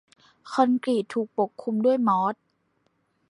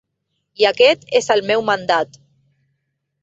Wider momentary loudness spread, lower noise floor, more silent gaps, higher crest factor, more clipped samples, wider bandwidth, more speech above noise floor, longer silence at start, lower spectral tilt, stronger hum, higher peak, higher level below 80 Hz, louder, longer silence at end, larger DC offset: about the same, 7 LU vs 6 LU; about the same, -71 dBFS vs -73 dBFS; neither; about the same, 20 dB vs 18 dB; neither; first, 11 kHz vs 8 kHz; second, 47 dB vs 57 dB; second, 0.45 s vs 0.6 s; first, -7 dB/octave vs -3 dB/octave; neither; second, -6 dBFS vs 0 dBFS; second, -80 dBFS vs -64 dBFS; second, -25 LUFS vs -16 LUFS; second, 0.95 s vs 1.15 s; neither